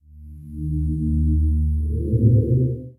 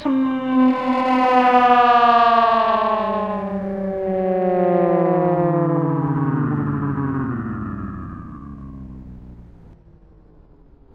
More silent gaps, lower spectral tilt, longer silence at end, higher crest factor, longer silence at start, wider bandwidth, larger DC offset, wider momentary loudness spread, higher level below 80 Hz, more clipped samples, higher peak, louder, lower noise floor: neither; first, -13.5 dB/octave vs -8.5 dB/octave; second, 0.05 s vs 1.2 s; about the same, 16 dB vs 18 dB; first, 0.15 s vs 0 s; second, 0.7 kHz vs 7 kHz; neither; second, 12 LU vs 21 LU; first, -24 dBFS vs -46 dBFS; neither; second, -4 dBFS vs 0 dBFS; second, -21 LUFS vs -18 LUFS; second, -40 dBFS vs -48 dBFS